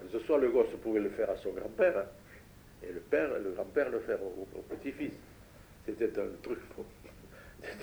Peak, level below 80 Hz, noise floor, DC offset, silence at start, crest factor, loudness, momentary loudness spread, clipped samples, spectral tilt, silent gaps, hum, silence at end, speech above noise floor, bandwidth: -14 dBFS; -60 dBFS; -55 dBFS; under 0.1%; 0 s; 20 dB; -34 LUFS; 23 LU; under 0.1%; -6.5 dB/octave; none; none; 0 s; 22 dB; over 20 kHz